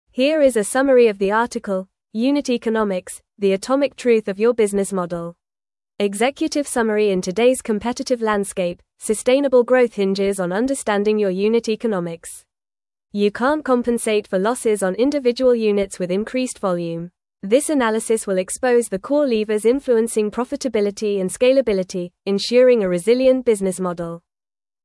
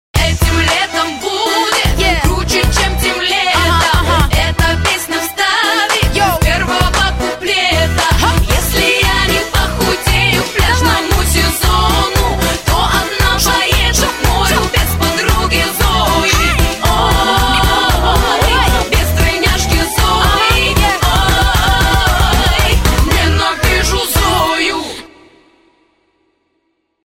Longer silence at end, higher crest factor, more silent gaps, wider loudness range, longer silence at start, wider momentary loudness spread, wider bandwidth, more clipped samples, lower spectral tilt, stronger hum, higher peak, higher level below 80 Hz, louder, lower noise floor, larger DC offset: second, 0.65 s vs 2 s; about the same, 16 dB vs 12 dB; neither; about the same, 3 LU vs 1 LU; about the same, 0.15 s vs 0.15 s; first, 10 LU vs 3 LU; second, 12 kHz vs 16.5 kHz; neither; first, -5 dB/octave vs -3.5 dB/octave; neither; second, -4 dBFS vs 0 dBFS; second, -54 dBFS vs -18 dBFS; second, -19 LUFS vs -12 LUFS; first, under -90 dBFS vs -64 dBFS; neither